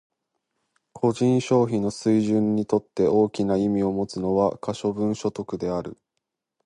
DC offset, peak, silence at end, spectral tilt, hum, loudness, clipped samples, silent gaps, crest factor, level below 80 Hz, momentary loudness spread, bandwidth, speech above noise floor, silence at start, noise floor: under 0.1%; -8 dBFS; 0.7 s; -7 dB/octave; none; -24 LUFS; under 0.1%; none; 16 dB; -56 dBFS; 8 LU; 11 kHz; 59 dB; 0.95 s; -81 dBFS